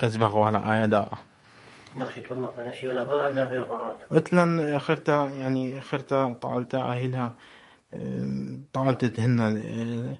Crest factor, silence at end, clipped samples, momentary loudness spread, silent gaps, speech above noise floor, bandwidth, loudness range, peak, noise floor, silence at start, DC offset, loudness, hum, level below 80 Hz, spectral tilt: 22 dB; 0 s; under 0.1%; 12 LU; none; 26 dB; 11.5 kHz; 4 LU; -4 dBFS; -52 dBFS; 0 s; under 0.1%; -27 LUFS; none; -62 dBFS; -7.5 dB/octave